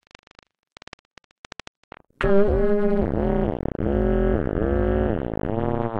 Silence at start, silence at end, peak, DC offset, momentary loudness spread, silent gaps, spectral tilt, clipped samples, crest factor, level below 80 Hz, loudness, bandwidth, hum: 2.2 s; 0 s; -4 dBFS; under 0.1%; 7 LU; none; -9 dB/octave; under 0.1%; 18 dB; -30 dBFS; -23 LUFS; 7.8 kHz; none